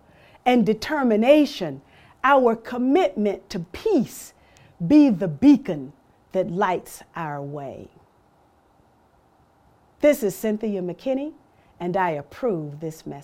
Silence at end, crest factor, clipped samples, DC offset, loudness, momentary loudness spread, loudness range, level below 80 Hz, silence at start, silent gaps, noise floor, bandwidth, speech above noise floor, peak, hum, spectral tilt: 0 s; 20 dB; under 0.1%; under 0.1%; -22 LUFS; 17 LU; 9 LU; -56 dBFS; 0.45 s; none; -59 dBFS; 16 kHz; 38 dB; -4 dBFS; none; -6.5 dB/octave